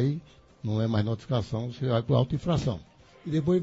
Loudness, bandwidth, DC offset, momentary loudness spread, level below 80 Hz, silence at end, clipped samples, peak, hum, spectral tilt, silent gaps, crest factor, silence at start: -29 LUFS; 8 kHz; under 0.1%; 12 LU; -50 dBFS; 0 s; under 0.1%; -12 dBFS; none; -8 dB/octave; none; 16 dB; 0 s